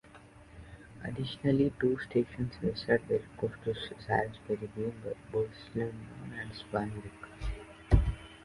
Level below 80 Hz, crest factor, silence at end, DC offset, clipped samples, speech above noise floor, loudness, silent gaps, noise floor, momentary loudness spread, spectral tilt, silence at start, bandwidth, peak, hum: -42 dBFS; 24 dB; 0 s; under 0.1%; under 0.1%; 21 dB; -34 LUFS; none; -55 dBFS; 15 LU; -7.5 dB/octave; 0.05 s; 11.5 kHz; -10 dBFS; none